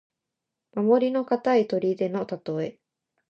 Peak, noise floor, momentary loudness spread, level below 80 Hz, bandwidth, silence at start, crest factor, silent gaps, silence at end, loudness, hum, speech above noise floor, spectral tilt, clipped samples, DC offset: -8 dBFS; -85 dBFS; 10 LU; -76 dBFS; 7 kHz; 0.75 s; 18 dB; none; 0.6 s; -25 LUFS; none; 61 dB; -8 dB/octave; under 0.1%; under 0.1%